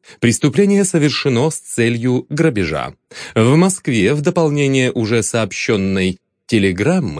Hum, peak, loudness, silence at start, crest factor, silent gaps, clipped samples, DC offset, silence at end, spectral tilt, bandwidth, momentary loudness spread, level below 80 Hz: none; 0 dBFS; -16 LUFS; 0.1 s; 14 dB; none; under 0.1%; under 0.1%; 0 s; -5.5 dB/octave; 10.5 kHz; 7 LU; -48 dBFS